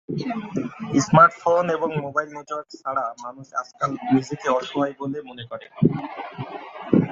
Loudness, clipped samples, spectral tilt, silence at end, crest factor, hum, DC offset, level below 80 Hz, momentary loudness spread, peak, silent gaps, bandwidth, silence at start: -23 LUFS; under 0.1%; -6.5 dB/octave; 0 s; 22 dB; none; under 0.1%; -58 dBFS; 18 LU; -2 dBFS; none; 7.8 kHz; 0.1 s